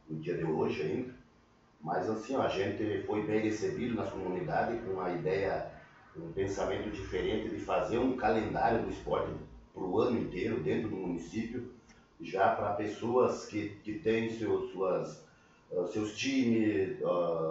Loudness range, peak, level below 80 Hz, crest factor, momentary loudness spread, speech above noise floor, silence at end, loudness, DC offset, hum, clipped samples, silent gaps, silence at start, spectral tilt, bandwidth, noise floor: 3 LU; -16 dBFS; -58 dBFS; 18 dB; 10 LU; 31 dB; 0 s; -33 LUFS; under 0.1%; none; under 0.1%; none; 0.05 s; -6 dB/octave; 8 kHz; -64 dBFS